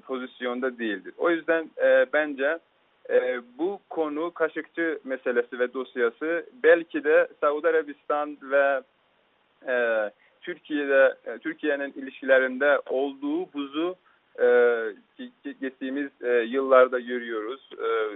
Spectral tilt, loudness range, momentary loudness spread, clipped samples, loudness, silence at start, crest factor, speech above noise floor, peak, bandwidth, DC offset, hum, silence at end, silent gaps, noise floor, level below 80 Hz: -1.5 dB/octave; 4 LU; 14 LU; under 0.1%; -25 LUFS; 0.05 s; 22 dB; 41 dB; -4 dBFS; 4 kHz; under 0.1%; none; 0 s; none; -66 dBFS; -78 dBFS